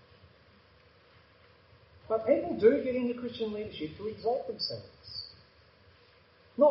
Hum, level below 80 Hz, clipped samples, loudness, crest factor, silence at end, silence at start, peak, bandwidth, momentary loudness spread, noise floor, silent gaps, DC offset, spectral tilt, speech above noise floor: none; -66 dBFS; under 0.1%; -31 LUFS; 22 dB; 0 s; 2.1 s; -10 dBFS; 5.8 kHz; 17 LU; -61 dBFS; none; under 0.1%; -4 dB/octave; 31 dB